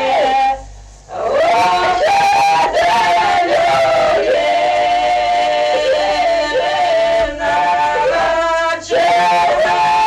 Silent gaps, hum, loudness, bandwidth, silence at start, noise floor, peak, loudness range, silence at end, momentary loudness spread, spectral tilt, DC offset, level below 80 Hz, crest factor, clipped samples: none; none; -13 LUFS; 12.5 kHz; 0 s; -35 dBFS; -6 dBFS; 2 LU; 0 s; 4 LU; -2.5 dB/octave; under 0.1%; -42 dBFS; 8 dB; under 0.1%